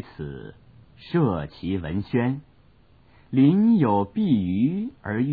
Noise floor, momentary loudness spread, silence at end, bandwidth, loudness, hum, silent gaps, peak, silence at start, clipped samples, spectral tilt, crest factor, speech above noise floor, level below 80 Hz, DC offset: -57 dBFS; 16 LU; 0 s; 4.9 kHz; -23 LUFS; none; none; -8 dBFS; 0.2 s; under 0.1%; -11.5 dB/octave; 16 dB; 34 dB; -52 dBFS; 0.1%